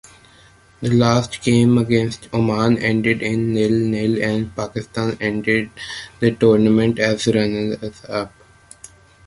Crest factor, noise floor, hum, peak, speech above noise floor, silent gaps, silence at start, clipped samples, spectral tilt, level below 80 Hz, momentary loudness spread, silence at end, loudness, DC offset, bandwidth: 18 dB; -49 dBFS; none; -2 dBFS; 32 dB; none; 0.8 s; under 0.1%; -6.5 dB/octave; -48 dBFS; 12 LU; 1 s; -18 LUFS; under 0.1%; 11.5 kHz